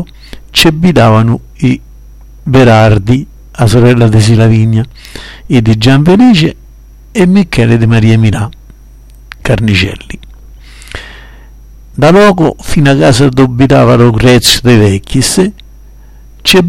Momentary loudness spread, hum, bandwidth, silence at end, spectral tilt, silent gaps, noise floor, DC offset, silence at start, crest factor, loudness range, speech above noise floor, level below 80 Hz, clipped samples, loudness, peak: 18 LU; none; 16.5 kHz; 0 s; -6 dB/octave; none; -33 dBFS; 1%; 0 s; 8 dB; 6 LU; 27 dB; -28 dBFS; 0.7%; -7 LUFS; 0 dBFS